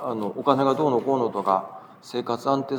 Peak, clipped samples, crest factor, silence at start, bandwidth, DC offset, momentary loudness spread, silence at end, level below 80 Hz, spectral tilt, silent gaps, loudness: -4 dBFS; under 0.1%; 20 dB; 0 s; 20 kHz; under 0.1%; 12 LU; 0 s; -80 dBFS; -7 dB/octave; none; -24 LUFS